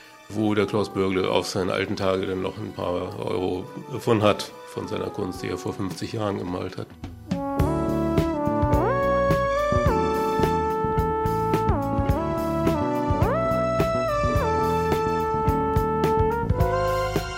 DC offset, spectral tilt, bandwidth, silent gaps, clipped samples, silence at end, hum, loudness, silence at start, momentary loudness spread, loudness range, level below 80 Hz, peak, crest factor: under 0.1%; -6.5 dB/octave; 16 kHz; none; under 0.1%; 0 s; none; -24 LUFS; 0 s; 8 LU; 4 LU; -36 dBFS; -4 dBFS; 20 dB